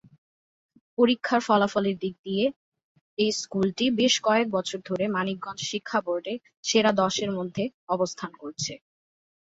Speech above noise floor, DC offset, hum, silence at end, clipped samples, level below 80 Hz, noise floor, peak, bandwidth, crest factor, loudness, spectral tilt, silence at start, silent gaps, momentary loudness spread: over 64 dB; under 0.1%; none; 0.7 s; under 0.1%; -66 dBFS; under -90 dBFS; -8 dBFS; 8 kHz; 20 dB; -26 LUFS; -4 dB/octave; 1 s; 2.19-2.24 s, 2.56-2.72 s, 2.84-2.95 s, 3.01-3.17 s, 6.57-6.63 s, 7.74-7.87 s; 11 LU